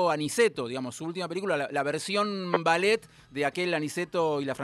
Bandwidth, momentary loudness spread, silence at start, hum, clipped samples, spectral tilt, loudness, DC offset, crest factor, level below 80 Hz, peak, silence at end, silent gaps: 13 kHz; 9 LU; 0 s; none; under 0.1%; -4 dB/octave; -28 LUFS; under 0.1%; 20 dB; -70 dBFS; -8 dBFS; 0 s; none